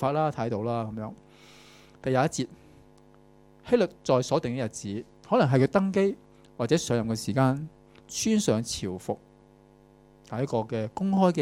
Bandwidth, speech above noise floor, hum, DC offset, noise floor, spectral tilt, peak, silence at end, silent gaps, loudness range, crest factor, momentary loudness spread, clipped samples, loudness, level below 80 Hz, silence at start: 15.5 kHz; 30 dB; 50 Hz at -55 dBFS; under 0.1%; -56 dBFS; -6 dB/octave; -8 dBFS; 0 s; none; 5 LU; 20 dB; 13 LU; under 0.1%; -27 LUFS; -60 dBFS; 0 s